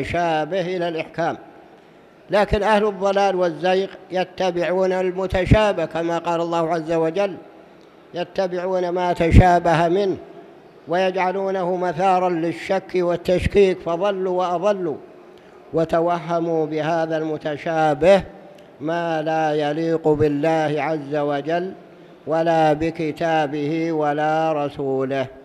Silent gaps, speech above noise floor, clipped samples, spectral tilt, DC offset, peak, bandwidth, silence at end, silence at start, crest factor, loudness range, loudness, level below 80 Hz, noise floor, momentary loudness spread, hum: none; 28 dB; under 0.1%; -7 dB/octave; under 0.1%; 0 dBFS; 12.5 kHz; 0 s; 0 s; 20 dB; 3 LU; -20 LUFS; -34 dBFS; -48 dBFS; 8 LU; none